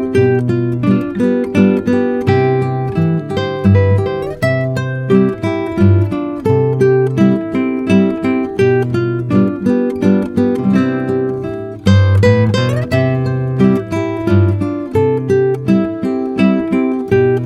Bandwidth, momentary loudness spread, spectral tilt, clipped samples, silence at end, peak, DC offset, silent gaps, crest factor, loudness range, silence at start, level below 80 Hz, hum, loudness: 10 kHz; 6 LU; -8.5 dB/octave; under 0.1%; 0 s; 0 dBFS; under 0.1%; none; 12 dB; 1 LU; 0 s; -44 dBFS; none; -14 LUFS